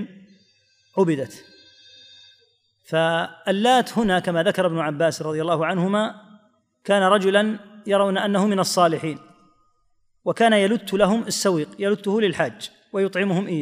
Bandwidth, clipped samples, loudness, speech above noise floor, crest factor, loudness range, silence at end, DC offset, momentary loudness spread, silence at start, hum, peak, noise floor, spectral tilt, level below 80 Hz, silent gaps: 15.5 kHz; under 0.1%; -21 LUFS; 44 dB; 18 dB; 3 LU; 0 s; under 0.1%; 11 LU; 0 s; none; -4 dBFS; -64 dBFS; -5 dB/octave; -60 dBFS; none